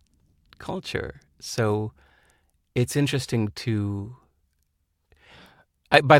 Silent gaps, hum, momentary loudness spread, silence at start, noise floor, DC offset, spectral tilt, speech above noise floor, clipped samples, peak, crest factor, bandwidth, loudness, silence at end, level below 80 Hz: none; none; 15 LU; 0.6 s; -72 dBFS; under 0.1%; -5.5 dB/octave; 50 dB; under 0.1%; 0 dBFS; 26 dB; 16.5 kHz; -27 LUFS; 0 s; -56 dBFS